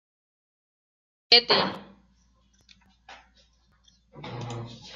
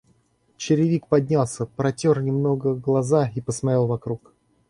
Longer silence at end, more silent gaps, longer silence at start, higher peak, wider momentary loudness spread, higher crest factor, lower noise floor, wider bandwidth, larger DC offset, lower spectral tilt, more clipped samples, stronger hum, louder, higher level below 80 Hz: second, 0 s vs 0.55 s; neither; first, 1.3 s vs 0.6 s; about the same, -2 dBFS vs -4 dBFS; first, 25 LU vs 7 LU; first, 28 dB vs 18 dB; about the same, -64 dBFS vs -63 dBFS; about the same, 12 kHz vs 11.5 kHz; neither; second, -4 dB/octave vs -7 dB/octave; neither; neither; about the same, -20 LUFS vs -22 LUFS; second, -64 dBFS vs -56 dBFS